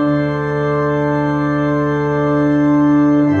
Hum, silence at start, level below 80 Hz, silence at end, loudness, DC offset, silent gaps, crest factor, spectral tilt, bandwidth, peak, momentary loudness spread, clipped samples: none; 0 s; -42 dBFS; 0 s; -15 LUFS; under 0.1%; none; 10 dB; -9 dB/octave; 6.6 kHz; -4 dBFS; 5 LU; under 0.1%